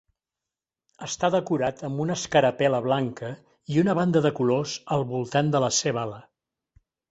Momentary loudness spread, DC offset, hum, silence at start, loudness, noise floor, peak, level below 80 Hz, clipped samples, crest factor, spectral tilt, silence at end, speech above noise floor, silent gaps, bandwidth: 13 LU; under 0.1%; none; 1 s; -25 LUFS; -89 dBFS; -6 dBFS; -62 dBFS; under 0.1%; 20 dB; -5 dB/octave; 0.9 s; 65 dB; none; 8.2 kHz